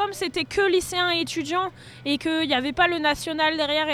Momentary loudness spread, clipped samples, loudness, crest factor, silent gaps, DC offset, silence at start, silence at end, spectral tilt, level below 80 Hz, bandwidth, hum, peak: 6 LU; under 0.1%; -23 LUFS; 18 dB; none; under 0.1%; 0 s; 0 s; -3 dB/octave; -52 dBFS; 16 kHz; none; -6 dBFS